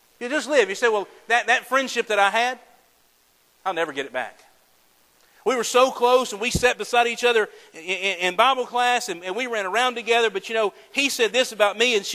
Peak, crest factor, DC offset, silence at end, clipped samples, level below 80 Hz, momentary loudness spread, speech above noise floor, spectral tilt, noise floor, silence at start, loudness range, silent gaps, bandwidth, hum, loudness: -2 dBFS; 20 dB; under 0.1%; 0 s; under 0.1%; -52 dBFS; 10 LU; 39 dB; -2 dB/octave; -61 dBFS; 0.2 s; 5 LU; none; 15.5 kHz; none; -21 LUFS